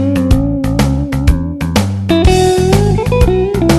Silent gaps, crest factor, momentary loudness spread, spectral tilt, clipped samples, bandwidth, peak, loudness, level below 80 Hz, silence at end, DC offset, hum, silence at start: none; 10 dB; 5 LU; -6.5 dB/octave; 0.3%; 13 kHz; 0 dBFS; -12 LUFS; -18 dBFS; 0 s; under 0.1%; none; 0 s